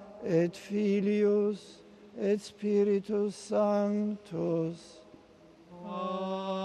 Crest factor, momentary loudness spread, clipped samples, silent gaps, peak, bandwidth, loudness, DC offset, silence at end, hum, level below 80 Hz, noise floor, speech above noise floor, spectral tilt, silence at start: 16 dB; 10 LU; under 0.1%; none; -16 dBFS; 11 kHz; -31 LUFS; under 0.1%; 0 s; none; -72 dBFS; -57 dBFS; 28 dB; -7 dB/octave; 0 s